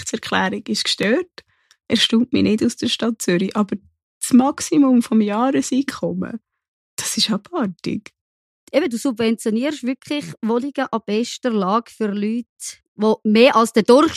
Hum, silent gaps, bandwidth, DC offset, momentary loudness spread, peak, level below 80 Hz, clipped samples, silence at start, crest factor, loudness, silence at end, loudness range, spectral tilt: none; 4.03-4.21 s, 6.68-6.97 s, 8.21-8.67 s, 12.49-12.56 s, 12.88-12.95 s; 14.5 kHz; under 0.1%; 12 LU; -2 dBFS; -60 dBFS; under 0.1%; 0 s; 18 dB; -19 LUFS; 0 s; 5 LU; -4 dB/octave